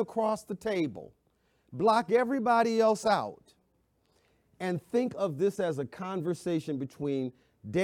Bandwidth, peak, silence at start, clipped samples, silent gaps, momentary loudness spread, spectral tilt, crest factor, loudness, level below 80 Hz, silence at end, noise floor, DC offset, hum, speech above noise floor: 15.5 kHz; -12 dBFS; 0 s; under 0.1%; none; 11 LU; -6 dB/octave; 18 dB; -30 LUFS; -70 dBFS; 0 s; -72 dBFS; under 0.1%; none; 43 dB